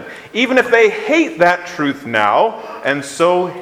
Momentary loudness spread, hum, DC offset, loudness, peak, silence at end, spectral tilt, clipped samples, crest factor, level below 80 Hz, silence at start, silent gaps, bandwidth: 8 LU; none; under 0.1%; -15 LUFS; 0 dBFS; 0 s; -4.5 dB/octave; under 0.1%; 16 dB; -60 dBFS; 0 s; none; 15 kHz